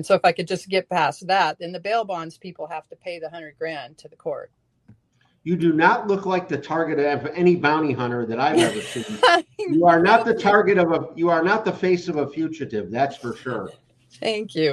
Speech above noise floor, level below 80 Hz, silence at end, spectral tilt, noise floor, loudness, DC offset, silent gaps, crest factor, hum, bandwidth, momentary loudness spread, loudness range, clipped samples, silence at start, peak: 42 dB; -64 dBFS; 0 s; -5.5 dB/octave; -63 dBFS; -21 LUFS; under 0.1%; none; 20 dB; none; 12 kHz; 17 LU; 11 LU; under 0.1%; 0 s; -2 dBFS